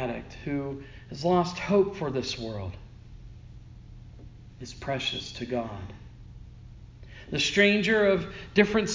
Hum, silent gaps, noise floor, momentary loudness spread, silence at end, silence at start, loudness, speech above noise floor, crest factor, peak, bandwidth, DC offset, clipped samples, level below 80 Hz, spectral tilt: none; none; -47 dBFS; 26 LU; 0 s; 0 s; -27 LUFS; 20 dB; 22 dB; -6 dBFS; 7.6 kHz; under 0.1%; under 0.1%; -50 dBFS; -5 dB/octave